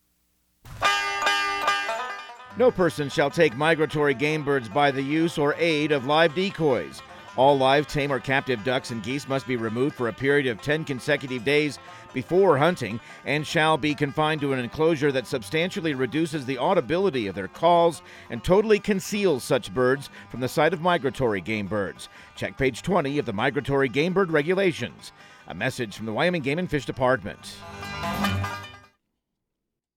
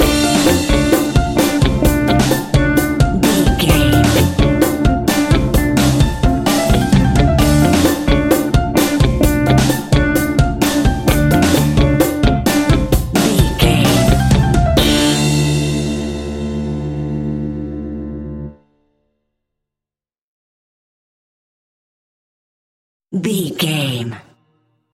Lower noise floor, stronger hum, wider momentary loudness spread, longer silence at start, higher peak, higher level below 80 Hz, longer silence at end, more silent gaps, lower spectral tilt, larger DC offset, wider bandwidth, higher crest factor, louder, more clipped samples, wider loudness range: second, -83 dBFS vs -89 dBFS; neither; about the same, 12 LU vs 10 LU; first, 0.65 s vs 0 s; second, -6 dBFS vs 0 dBFS; second, -52 dBFS vs -22 dBFS; first, 1.15 s vs 0.75 s; second, none vs 20.21-23.00 s; about the same, -5.5 dB/octave vs -5.5 dB/octave; neither; about the same, 17 kHz vs 16.5 kHz; about the same, 18 dB vs 14 dB; second, -24 LUFS vs -14 LUFS; neither; second, 3 LU vs 12 LU